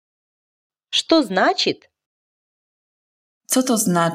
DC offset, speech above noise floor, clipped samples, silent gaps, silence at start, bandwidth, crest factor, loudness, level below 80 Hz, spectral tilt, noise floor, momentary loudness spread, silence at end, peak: under 0.1%; over 72 dB; under 0.1%; 2.06-3.41 s; 0.9 s; 16 kHz; 20 dB; -18 LUFS; -68 dBFS; -3.5 dB/octave; under -90 dBFS; 5 LU; 0 s; -2 dBFS